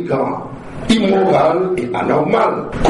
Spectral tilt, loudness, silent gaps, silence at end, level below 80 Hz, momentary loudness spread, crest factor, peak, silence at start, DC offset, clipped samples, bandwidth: -6 dB/octave; -15 LUFS; none; 0 s; -34 dBFS; 12 LU; 14 dB; -2 dBFS; 0 s; under 0.1%; under 0.1%; 11.5 kHz